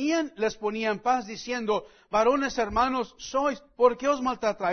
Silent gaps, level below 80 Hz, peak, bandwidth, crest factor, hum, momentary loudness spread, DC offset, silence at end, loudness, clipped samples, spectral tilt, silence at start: none; -52 dBFS; -6 dBFS; 6.6 kHz; 20 dB; none; 7 LU; under 0.1%; 0 s; -27 LUFS; under 0.1%; -4 dB/octave; 0 s